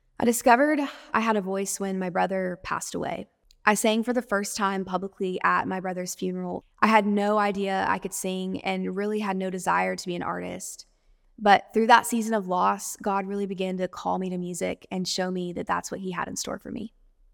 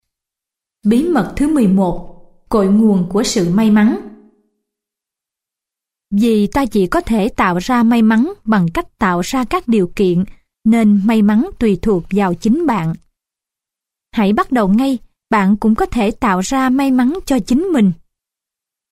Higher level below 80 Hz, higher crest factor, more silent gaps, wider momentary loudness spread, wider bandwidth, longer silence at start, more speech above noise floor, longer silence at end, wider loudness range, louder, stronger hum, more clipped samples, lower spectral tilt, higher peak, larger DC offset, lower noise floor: second, -60 dBFS vs -38 dBFS; first, 22 dB vs 12 dB; neither; first, 12 LU vs 7 LU; first, 19 kHz vs 14.5 kHz; second, 0.2 s vs 0.85 s; second, 36 dB vs 72 dB; second, 0.45 s vs 0.95 s; about the same, 5 LU vs 3 LU; second, -26 LUFS vs -15 LUFS; neither; neither; second, -4 dB/octave vs -6.5 dB/octave; about the same, -4 dBFS vs -2 dBFS; neither; second, -62 dBFS vs -86 dBFS